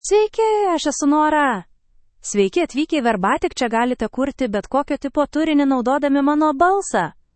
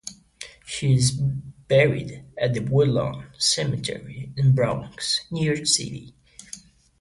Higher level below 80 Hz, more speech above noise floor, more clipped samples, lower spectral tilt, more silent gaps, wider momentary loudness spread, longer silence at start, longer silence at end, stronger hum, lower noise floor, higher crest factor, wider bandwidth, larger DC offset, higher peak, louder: about the same, -48 dBFS vs -50 dBFS; first, 35 dB vs 22 dB; neither; about the same, -4 dB/octave vs -4.5 dB/octave; neither; second, 6 LU vs 20 LU; about the same, 0.05 s vs 0.05 s; second, 0.25 s vs 0.4 s; neither; first, -53 dBFS vs -45 dBFS; about the same, 14 dB vs 18 dB; second, 8.8 kHz vs 11.5 kHz; neither; about the same, -4 dBFS vs -6 dBFS; first, -19 LUFS vs -23 LUFS